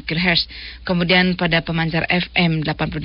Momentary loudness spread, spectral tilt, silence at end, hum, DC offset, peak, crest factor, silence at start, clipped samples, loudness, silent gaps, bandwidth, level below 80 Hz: 8 LU; -9.5 dB/octave; 0 s; none; under 0.1%; -2 dBFS; 16 dB; 0.05 s; under 0.1%; -18 LUFS; none; 5.8 kHz; -38 dBFS